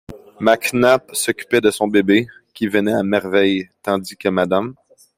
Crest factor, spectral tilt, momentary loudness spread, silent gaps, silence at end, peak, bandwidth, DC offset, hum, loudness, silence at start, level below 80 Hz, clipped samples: 16 dB; -4.5 dB/octave; 7 LU; none; 0.45 s; -2 dBFS; 16 kHz; under 0.1%; none; -17 LUFS; 0.1 s; -56 dBFS; under 0.1%